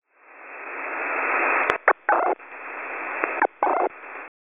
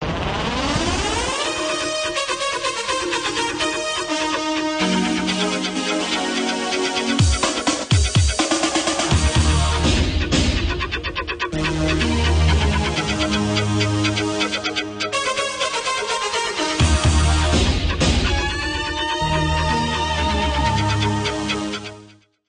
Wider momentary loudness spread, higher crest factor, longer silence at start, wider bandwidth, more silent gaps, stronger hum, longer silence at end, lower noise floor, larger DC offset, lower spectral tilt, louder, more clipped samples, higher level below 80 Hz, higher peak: first, 15 LU vs 5 LU; first, 26 dB vs 14 dB; first, 0.3 s vs 0 s; second, 3.7 kHz vs 10 kHz; neither; neither; second, 0.15 s vs 0.4 s; about the same, -46 dBFS vs -47 dBFS; neither; second, 5.5 dB/octave vs -4 dB/octave; second, -24 LUFS vs -20 LUFS; neither; second, -68 dBFS vs -26 dBFS; first, 0 dBFS vs -6 dBFS